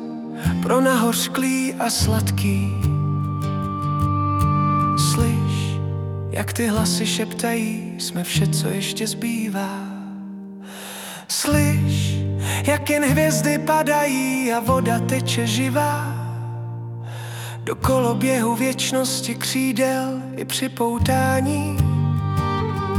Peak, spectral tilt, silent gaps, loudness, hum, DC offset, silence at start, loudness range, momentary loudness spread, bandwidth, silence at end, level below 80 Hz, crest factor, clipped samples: -4 dBFS; -5 dB/octave; none; -21 LUFS; none; under 0.1%; 0 s; 4 LU; 12 LU; 18 kHz; 0 s; -44 dBFS; 16 dB; under 0.1%